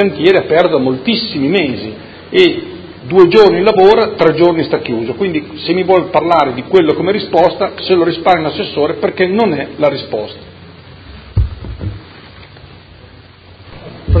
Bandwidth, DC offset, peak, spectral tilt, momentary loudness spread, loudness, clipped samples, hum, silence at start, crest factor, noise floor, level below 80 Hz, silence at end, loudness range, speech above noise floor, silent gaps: 8 kHz; under 0.1%; 0 dBFS; -7.5 dB/octave; 16 LU; -12 LUFS; 0.4%; none; 0 s; 12 dB; -38 dBFS; -30 dBFS; 0 s; 14 LU; 27 dB; none